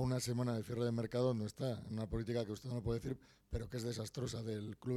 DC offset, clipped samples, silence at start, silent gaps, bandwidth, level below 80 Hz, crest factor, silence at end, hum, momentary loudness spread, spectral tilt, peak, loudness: under 0.1%; under 0.1%; 0 s; none; 14 kHz; -56 dBFS; 16 dB; 0 s; none; 7 LU; -6.5 dB/octave; -24 dBFS; -41 LUFS